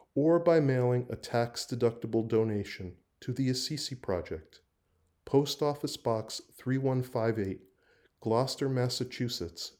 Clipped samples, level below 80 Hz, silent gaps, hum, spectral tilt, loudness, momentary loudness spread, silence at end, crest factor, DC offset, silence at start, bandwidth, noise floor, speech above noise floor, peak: under 0.1%; -66 dBFS; none; none; -6 dB/octave; -31 LUFS; 14 LU; 0.1 s; 18 dB; under 0.1%; 0.15 s; over 20 kHz; -74 dBFS; 43 dB; -12 dBFS